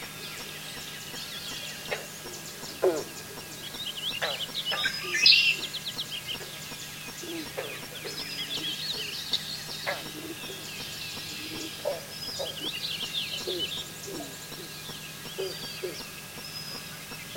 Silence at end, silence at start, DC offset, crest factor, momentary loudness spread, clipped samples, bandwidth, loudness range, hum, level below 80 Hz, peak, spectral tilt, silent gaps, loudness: 0 s; 0 s; under 0.1%; 28 dB; 10 LU; under 0.1%; 17 kHz; 9 LU; none; -62 dBFS; -6 dBFS; -1.5 dB/octave; none; -30 LUFS